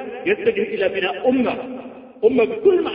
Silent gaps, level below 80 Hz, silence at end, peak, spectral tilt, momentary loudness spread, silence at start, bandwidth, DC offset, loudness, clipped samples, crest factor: none; -58 dBFS; 0 s; -4 dBFS; -10 dB/octave; 14 LU; 0 s; 5.2 kHz; under 0.1%; -19 LUFS; under 0.1%; 16 dB